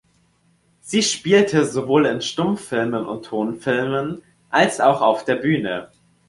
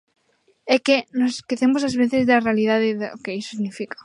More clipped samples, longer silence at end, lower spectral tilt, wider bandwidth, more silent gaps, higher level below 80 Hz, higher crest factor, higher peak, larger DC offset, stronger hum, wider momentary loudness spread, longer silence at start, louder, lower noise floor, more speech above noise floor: neither; first, 0.4 s vs 0.2 s; about the same, -4.5 dB/octave vs -5 dB/octave; about the same, 11.5 kHz vs 11 kHz; neither; about the same, -60 dBFS vs -62 dBFS; about the same, 18 dB vs 18 dB; about the same, -2 dBFS vs -4 dBFS; neither; neither; about the same, 10 LU vs 11 LU; first, 0.85 s vs 0.65 s; about the same, -20 LUFS vs -21 LUFS; about the same, -61 dBFS vs -64 dBFS; about the same, 42 dB vs 43 dB